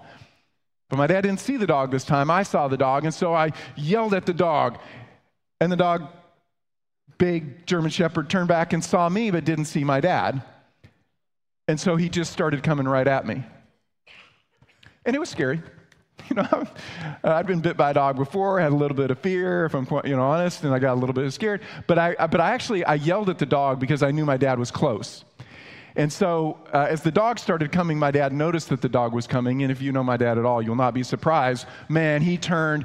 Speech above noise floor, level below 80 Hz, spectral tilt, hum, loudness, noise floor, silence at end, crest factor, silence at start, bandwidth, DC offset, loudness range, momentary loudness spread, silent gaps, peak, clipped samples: over 68 dB; -60 dBFS; -6.5 dB/octave; none; -23 LUFS; under -90 dBFS; 0 s; 18 dB; 0.05 s; 12.5 kHz; under 0.1%; 4 LU; 6 LU; none; -4 dBFS; under 0.1%